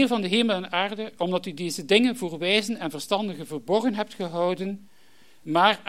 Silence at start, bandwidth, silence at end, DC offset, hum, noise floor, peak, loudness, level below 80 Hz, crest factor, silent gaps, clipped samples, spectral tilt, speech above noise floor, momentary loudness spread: 0 s; 16 kHz; 0.1 s; 0.3%; none; -59 dBFS; -6 dBFS; -25 LUFS; -76 dBFS; 20 dB; none; under 0.1%; -4.5 dB/octave; 34 dB; 11 LU